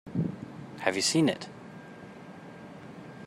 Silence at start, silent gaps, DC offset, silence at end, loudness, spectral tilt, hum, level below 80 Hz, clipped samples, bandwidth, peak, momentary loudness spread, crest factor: 0.05 s; none; under 0.1%; 0 s; -29 LUFS; -4 dB/octave; none; -68 dBFS; under 0.1%; 15.5 kHz; -8 dBFS; 21 LU; 26 dB